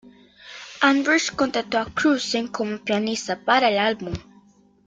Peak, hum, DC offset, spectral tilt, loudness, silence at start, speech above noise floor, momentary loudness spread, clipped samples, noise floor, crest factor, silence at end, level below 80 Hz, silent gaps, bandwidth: -6 dBFS; none; under 0.1%; -3.5 dB/octave; -22 LUFS; 0.05 s; 33 dB; 15 LU; under 0.1%; -55 dBFS; 18 dB; 0.65 s; -54 dBFS; none; 9.4 kHz